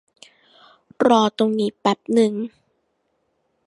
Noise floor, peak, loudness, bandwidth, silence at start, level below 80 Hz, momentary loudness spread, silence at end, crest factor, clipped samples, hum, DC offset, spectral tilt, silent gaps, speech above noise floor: -70 dBFS; -2 dBFS; -19 LUFS; 11.5 kHz; 1 s; -70 dBFS; 9 LU; 1.2 s; 20 dB; under 0.1%; none; under 0.1%; -5.5 dB/octave; none; 51 dB